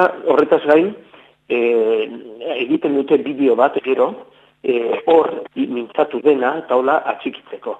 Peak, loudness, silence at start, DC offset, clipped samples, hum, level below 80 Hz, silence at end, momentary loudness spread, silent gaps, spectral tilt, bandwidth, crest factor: 0 dBFS; -17 LUFS; 0 s; under 0.1%; under 0.1%; none; -68 dBFS; 0 s; 11 LU; none; -7 dB/octave; 4.4 kHz; 16 dB